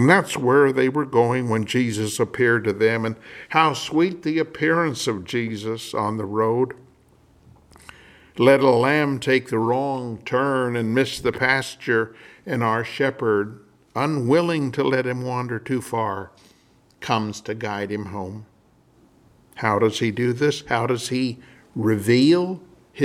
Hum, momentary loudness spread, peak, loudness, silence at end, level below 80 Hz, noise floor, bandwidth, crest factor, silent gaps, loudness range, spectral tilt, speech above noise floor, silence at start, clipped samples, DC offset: none; 12 LU; -2 dBFS; -21 LUFS; 0 s; -60 dBFS; -57 dBFS; 15.5 kHz; 20 dB; none; 7 LU; -5.5 dB/octave; 36 dB; 0 s; under 0.1%; under 0.1%